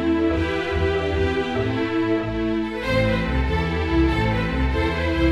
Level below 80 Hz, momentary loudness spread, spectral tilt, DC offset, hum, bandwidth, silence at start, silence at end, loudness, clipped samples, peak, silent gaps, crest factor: -28 dBFS; 3 LU; -7.5 dB/octave; under 0.1%; none; 11 kHz; 0 s; 0 s; -22 LUFS; under 0.1%; -8 dBFS; none; 14 dB